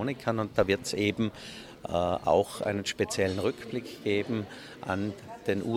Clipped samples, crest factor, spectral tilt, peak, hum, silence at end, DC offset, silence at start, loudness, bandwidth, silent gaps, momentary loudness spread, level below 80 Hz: under 0.1%; 20 dB; -5 dB/octave; -10 dBFS; none; 0 s; under 0.1%; 0 s; -30 LUFS; 16.5 kHz; none; 11 LU; -58 dBFS